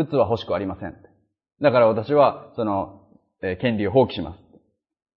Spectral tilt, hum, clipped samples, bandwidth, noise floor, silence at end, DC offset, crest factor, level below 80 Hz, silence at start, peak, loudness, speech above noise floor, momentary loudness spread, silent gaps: -9 dB/octave; none; under 0.1%; 5.8 kHz; -59 dBFS; 0.85 s; under 0.1%; 20 dB; -54 dBFS; 0 s; -4 dBFS; -22 LUFS; 38 dB; 15 LU; none